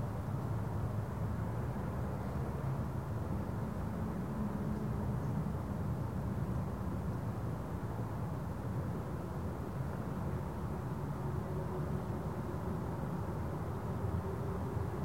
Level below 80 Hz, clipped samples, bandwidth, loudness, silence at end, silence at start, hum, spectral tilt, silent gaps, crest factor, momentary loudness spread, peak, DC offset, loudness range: -48 dBFS; under 0.1%; 16 kHz; -39 LUFS; 0 s; 0 s; none; -8.5 dB/octave; none; 14 dB; 2 LU; -24 dBFS; 0.2%; 2 LU